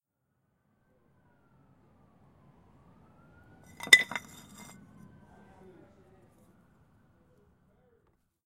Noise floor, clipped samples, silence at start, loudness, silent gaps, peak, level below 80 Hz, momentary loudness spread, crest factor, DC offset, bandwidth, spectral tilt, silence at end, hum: -79 dBFS; under 0.1%; 3.85 s; -22 LUFS; none; -2 dBFS; -72 dBFS; 30 LU; 36 dB; under 0.1%; 16 kHz; 0 dB/octave; 4.3 s; none